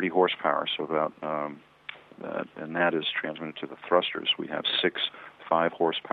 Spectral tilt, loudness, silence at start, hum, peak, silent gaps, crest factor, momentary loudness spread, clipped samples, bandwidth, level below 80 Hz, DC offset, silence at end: -7 dB/octave; -28 LUFS; 0 s; none; -8 dBFS; none; 22 dB; 15 LU; under 0.1%; 5.2 kHz; -76 dBFS; under 0.1%; 0 s